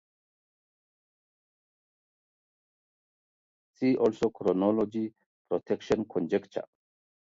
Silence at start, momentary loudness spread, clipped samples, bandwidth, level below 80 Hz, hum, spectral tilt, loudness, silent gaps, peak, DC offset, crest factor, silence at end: 3.8 s; 12 LU; under 0.1%; 7.8 kHz; -66 dBFS; none; -7.5 dB/octave; -29 LUFS; 5.26-5.45 s; -12 dBFS; under 0.1%; 20 dB; 0.6 s